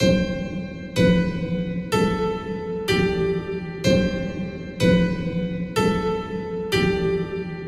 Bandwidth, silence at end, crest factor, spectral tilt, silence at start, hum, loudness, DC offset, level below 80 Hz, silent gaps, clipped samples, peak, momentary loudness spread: 14 kHz; 0 s; 16 dB; -6.5 dB/octave; 0 s; none; -23 LUFS; under 0.1%; -38 dBFS; none; under 0.1%; -6 dBFS; 10 LU